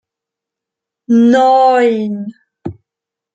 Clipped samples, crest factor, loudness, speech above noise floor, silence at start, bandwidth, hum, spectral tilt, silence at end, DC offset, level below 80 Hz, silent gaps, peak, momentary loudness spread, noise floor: under 0.1%; 12 dB; -11 LUFS; 74 dB; 1.1 s; 8 kHz; none; -6.5 dB/octave; 0.65 s; under 0.1%; -60 dBFS; none; -2 dBFS; 21 LU; -84 dBFS